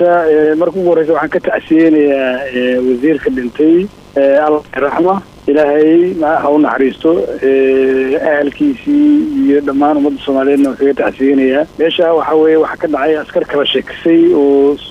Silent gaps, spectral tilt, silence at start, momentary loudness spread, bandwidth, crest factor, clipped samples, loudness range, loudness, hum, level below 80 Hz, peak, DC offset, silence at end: none; -7 dB/octave; 0 s; 5 LU; 9 kHz; 8 dB; under 0.1%; 1 LU; -11 LUFS; none; -46 dBFS; -2 dBFS; under 0.1%; 0 s